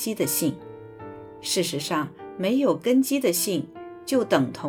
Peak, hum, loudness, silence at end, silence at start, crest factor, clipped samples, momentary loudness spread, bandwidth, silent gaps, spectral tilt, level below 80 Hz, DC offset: -6 dBFS; none; -24 LUFS; 0 s; 0 s; 18 dB; under 0.1%; 19 LU; 19 kHz; none; -4 dB/octave; -66 dBFS; under 0.1%